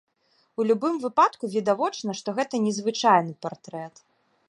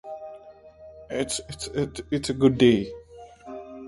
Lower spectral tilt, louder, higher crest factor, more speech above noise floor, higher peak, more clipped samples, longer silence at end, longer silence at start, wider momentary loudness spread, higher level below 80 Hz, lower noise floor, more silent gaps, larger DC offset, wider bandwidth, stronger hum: about the same, -4.5 dB/octave vs -5.5 dB/octave; about the same, -24 LUFS vs -24 LUFS; about the same, 20 dB vs 20 dB; first, 43 dB vs 24 dB; about the same, -6 dBFS vs -6 dBFS; neither; first, 0.6 s vs 0 s; first, 0.6 s vs 0.05 s; second, 17 LU vs 24 LU; second, -76 dBFS vs -50 dBFS; first, -67 dBFS vs -48 dBFS; neither; neither; about the same, 11.5 kHz vs 11.5 kHz; neither